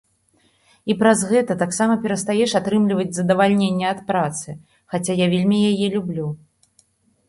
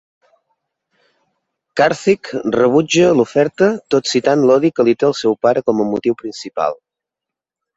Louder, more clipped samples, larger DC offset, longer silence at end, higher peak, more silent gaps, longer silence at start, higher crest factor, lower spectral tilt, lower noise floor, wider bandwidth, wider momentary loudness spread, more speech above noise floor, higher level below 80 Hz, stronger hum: second, -19 LUFS vs -15 LUFS; neither; neither; about the same, 0.95 s vs 1.05 s; about the same, -2 dBFS vs -2 dBFS; neither; second, 0.85 s vs 1.75 s; about the same, 18 dB vs 16 dB; about the same, -5.5 dB/octave vs -5 dB/octave; second, -62 dBFS vs -85 dBFS; first, 11.5 kHz vs 8 kHz; first, 12 LU vs 9 LU; second, 43 dB vs 70 dB; about the same, -60 dBFS vs -58 dBFS; neither